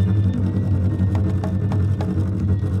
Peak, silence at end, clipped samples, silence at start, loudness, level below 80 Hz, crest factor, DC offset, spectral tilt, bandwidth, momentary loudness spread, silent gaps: -8 dBFS; 0 s; under 0.1%; 0 s; -21 LUFS; -36 dBFS; 10 dB; under 0.1%; -9.5 dB/octave; 5.6 kHz; 2 LU; none